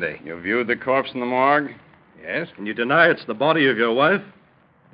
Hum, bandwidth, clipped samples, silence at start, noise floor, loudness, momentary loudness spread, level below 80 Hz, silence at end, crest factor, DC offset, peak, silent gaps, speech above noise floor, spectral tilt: none; 5.2 kHz; under 0.1%; 0 s; -56 dBFS; -20 LUFS; 12 LU; -66 dBFS; 0.65 s; 20 dB; under 0.1%; -2 dBFS; none; 35 dB; -10 dB/octave